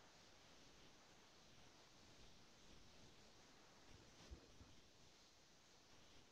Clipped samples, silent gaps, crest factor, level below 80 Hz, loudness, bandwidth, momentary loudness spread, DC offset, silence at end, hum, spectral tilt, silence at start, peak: under 0.1%; none; 22 dB; -74 dBFS; -67 LUFS; 10 kHz; 5 LU; under 0.1%; 0 s; none; -3 dB/octave; 0 s; -46 dBFS